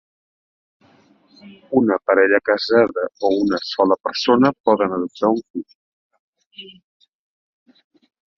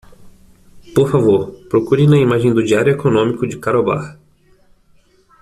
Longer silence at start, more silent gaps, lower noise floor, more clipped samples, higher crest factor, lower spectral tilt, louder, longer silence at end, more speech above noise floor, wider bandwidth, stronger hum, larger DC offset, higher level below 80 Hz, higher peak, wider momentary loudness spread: first, 1.45 s vs 0.2 s; first, 4.60-4.64 s, 5.50-5.54 s, 5.75-6.10 s, 6.19-6.33 s, 6.46-6.51 s vs none; about the same, -55 dBFS vs -52 dBFS; neither; about the same, 18 dB vs 14 dB; second, -6 dB/octave vs -7.5 dB/octave; second, -18 LUFS vs -15 LUFS; first, 1.65 s vs 1.3 s; about the same, 37 dB vs 38 dB; second, 7 kHz vs 13 kHz; neither; neither; second, -62 dBFS vs -48 dBFS; about the same, -2 dBFS vs -2 dBFS; first, 14 LU vs 8 LU